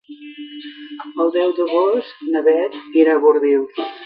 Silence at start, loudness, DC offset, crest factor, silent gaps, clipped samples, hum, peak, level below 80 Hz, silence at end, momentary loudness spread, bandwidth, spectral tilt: 0.1 s; -17 LUFS; under 0.1%; 16 dB; none; under 0.1%; none; -2 dBFS; -78 dBFS; 0 s; 20 LU; 5.2 kHz; -7 dB/octave